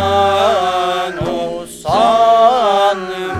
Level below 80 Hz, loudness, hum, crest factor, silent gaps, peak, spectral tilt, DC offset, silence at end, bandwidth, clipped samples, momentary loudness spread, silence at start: -44 dBFS; -13 LUFS; none; 14 dB; none; 0 dBFS; -4.5 dB/octave; under 0.1%; 0 s; 14 kHz; under 0.1%; 11 LU; 0 s